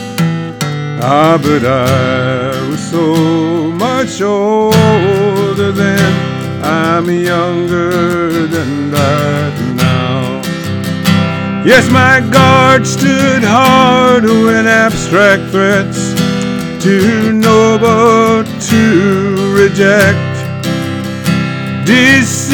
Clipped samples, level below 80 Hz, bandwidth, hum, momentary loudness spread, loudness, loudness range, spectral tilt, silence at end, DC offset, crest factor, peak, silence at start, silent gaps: 1%; -44 dBFS; 19.5 kHz; none; 9 LU; -10 LUFS; 5 LU; -5.5 dB/octave; 0 s; under 0.1%; 10 dB; 0 dBFS; 0 s; none